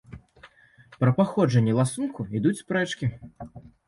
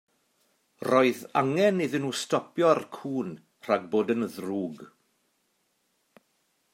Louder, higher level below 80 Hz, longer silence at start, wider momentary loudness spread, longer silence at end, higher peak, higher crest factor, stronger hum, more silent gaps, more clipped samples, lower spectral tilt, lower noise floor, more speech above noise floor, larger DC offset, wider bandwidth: about the same, -25 LUFS vs -27 LUFS; first, -56 dBFS vs -80 dBFS; second, 0.1 s vs 0.8 s; first, 21 LU vs 13 LU; second, 0.25 s vs 1.9 s; about the same, -8 dBFS vs -8 dBFS; about the same, 18 dB vs 22 dB; neither; neither; neither; first, -7 dB/octave vs -5.5 dB/octave; second, -54 dBFS vs -73 dBFS; second, 30 dB vs 47 dB; neither; second, 11.5 kHz vs 16 kHz